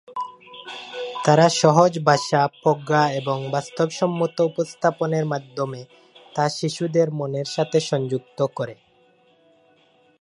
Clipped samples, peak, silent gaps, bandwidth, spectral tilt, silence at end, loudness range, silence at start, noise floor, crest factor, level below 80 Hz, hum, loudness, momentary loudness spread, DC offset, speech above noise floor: under 0.1%; 0 dBFS; none; 11.5 kHz; -5.5 dB/octave; 1.5 s; 6 LU; 0.1 s; -58 dBFS; 22 dB; -70 dBFS; none; -22 LUFS; 16 LU; under 0.1%; 38 dB